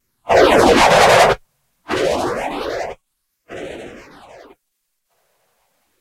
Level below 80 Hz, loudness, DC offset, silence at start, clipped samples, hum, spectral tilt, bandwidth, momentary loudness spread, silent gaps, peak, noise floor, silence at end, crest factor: -40 dBFS; -14 LUFS; under 0.1%; 0.25 s; under 0.1%; none; -3.5 dB/octave; 16 kHz; 22 LU; none; 0 dBFS; -73 dBFS; 2.05 s; 18 dB